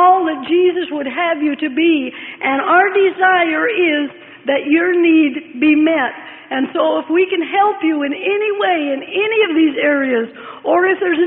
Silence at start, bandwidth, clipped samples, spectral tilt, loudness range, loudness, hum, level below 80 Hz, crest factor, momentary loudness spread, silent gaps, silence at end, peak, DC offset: 0 s; 3.9 kHz; under 0.1%; -9 dB/octave; 2 LU; -15 LUFS; none; -64 dBFS; 14 dB; 9 LU; none; 0 s; 0 dBFS; under 0.1%